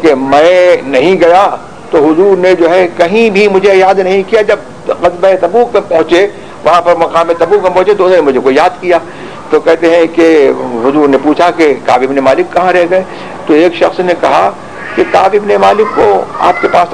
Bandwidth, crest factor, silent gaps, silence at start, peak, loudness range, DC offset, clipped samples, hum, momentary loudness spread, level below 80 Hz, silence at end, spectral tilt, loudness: 11 kHz; 8 dB; none; 0 s; 0 dBFS; 2 LU; 1%; 4%; none; 6 LU; -42 dBFS; 0 s; -5.5 dB/octave; -8 LUFS